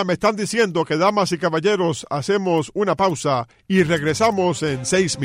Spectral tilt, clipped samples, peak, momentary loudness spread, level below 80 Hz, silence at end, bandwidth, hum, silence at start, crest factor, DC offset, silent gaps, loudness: -5 dB/octave; under 0.1%; -4 dBFS; 4 LU; -52 dBFS; 0 s; 16 kHz; none; 0 s; 14 dB; under 0.1%; none; -20 LUFS